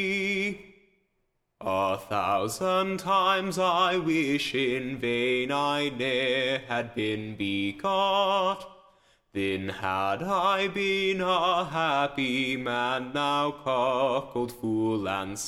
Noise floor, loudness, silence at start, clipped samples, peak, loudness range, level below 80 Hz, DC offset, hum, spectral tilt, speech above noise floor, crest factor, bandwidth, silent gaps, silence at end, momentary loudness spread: -75 dBFS; -27 LUFS; 0 s; under 0.1%; -12 dBFS; 3 LU; -62 dBFS; under 0.1%; none; -4.5 dB/octave; 48 dB; 16 dB; 16 kHz; none; 0 s; 6 LU